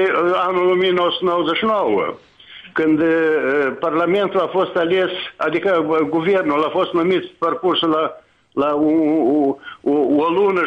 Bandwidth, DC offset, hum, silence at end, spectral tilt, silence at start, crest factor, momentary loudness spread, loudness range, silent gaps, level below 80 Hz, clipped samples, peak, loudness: 6.6 kHz; under 0.1%; none; 0 s; -7 dB/octave; 0 s; 10 dB; 6 LU; 1 LU; none; -60 dBFS; under 0.1%; -8 dBFS; -18 LUFS